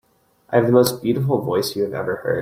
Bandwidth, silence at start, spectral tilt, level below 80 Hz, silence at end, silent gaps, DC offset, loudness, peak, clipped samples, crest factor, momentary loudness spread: 16.5 kHz; 0.5 s; -6 dB/octave; -58 dBFS; 0 s; none; under 0.1%; -20 LUFS; -2 dBFS; under 0.1%; 18 dB; 8 LU